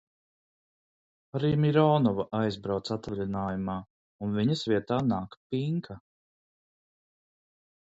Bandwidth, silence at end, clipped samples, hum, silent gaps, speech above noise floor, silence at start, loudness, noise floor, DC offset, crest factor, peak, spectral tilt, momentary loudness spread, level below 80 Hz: 8 kHz; 1.85 s; under 0.1%; none; 3.90-4.19 s, 5.37-5.50 s; over 62 dB; 1.35 s; -29 LUFS; under -90 dBFS; under 0.1%; 20 dB; -10 dBFS; -8 dB/octave; 13 LU; -58 dBFS